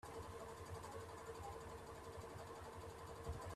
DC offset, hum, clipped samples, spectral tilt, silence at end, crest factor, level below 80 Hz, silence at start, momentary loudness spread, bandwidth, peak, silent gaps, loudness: under 0.1%; none; under 0.1%; -5 dB/octave; 0 s; 16 dB; -64 dBFS; 0.05 s; 2 LU; 14.5 kHz; -36 dBFS; none; -53 LUFS